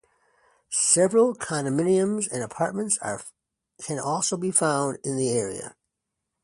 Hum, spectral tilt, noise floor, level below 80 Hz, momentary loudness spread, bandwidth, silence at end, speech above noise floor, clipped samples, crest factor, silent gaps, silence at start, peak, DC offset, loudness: none; -4 dB/octave; -83 dBFS; -66 dBFS; 14 LU; 11.5 kHz; 0.7 s; 58 dB; under 0.1%; 22 dB; none; 0.7 s; -4 dBFS; under 0.1%; -24 LUFS